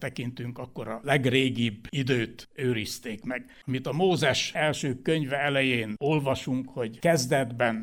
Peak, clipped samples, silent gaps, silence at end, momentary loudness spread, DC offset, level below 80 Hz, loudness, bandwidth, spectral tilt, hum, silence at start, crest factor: -8 dBFS; under 0.1%; none; 0 s; 11 LU; under 0.1%; -60 dBFS; -27 LUFS; 17.5 kHz; -5 dB/octave; none; 0 s; 20 dB